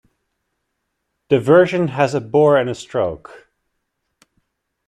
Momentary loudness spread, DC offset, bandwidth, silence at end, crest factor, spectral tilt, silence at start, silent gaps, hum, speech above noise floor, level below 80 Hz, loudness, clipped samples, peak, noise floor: 10 LU; under 0.1%; 10.5 kHz; 1.5 s; 18 dB; -7 dB/octave; 1.3 s; none; none; 58 dB; -56 dBFS; -16 LUFS; under 0.1%; -2 dBFS; -74 dBFS